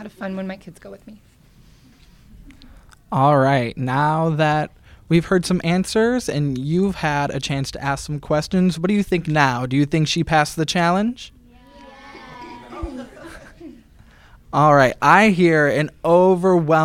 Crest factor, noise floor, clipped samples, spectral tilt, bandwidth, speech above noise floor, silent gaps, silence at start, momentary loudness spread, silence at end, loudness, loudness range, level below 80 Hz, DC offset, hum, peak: 20 dB; -50 dBFS; under 0.1%; -6 dB/octave; 15.5 kHz; 32 dB; none; 0 s; 22 LU; 0 s; -18 LUFS; 9 LU; -44 dBFS; under 0.1%; none; 0 dBFS